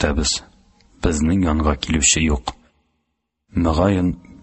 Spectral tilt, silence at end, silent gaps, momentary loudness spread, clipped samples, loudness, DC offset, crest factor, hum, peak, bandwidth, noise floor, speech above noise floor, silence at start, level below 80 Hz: -4 dB/octave; 0.25 s; none; 10 LU; under 0.1%; -19 LUFS; under 0.1%; 18 dB; none; -2 dBFS; 8.6 kHz; -74 dBFS; 56 dB; 0 s; -28 dBFS